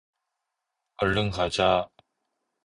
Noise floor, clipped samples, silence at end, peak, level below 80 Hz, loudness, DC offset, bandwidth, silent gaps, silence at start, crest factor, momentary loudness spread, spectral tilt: -83 dBFS; under 0.1%; 0.8 s; -8 dBFS; -48 dBFS; -25 LUFS; under 0.1%; 11.5 kHz; none; 1 s; 20 dB; 6 LU; -5 dB/octave